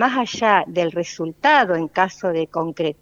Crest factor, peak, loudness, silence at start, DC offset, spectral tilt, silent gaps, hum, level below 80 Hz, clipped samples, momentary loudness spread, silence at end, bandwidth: 18 dB; -2 dBFS; -19 LUFS; 0 s; under 0.1%; -4.5 dB/octave; none; none; -62 dBFS; under 0.1%; 9 LU; 0.1 s; 7.6 kHz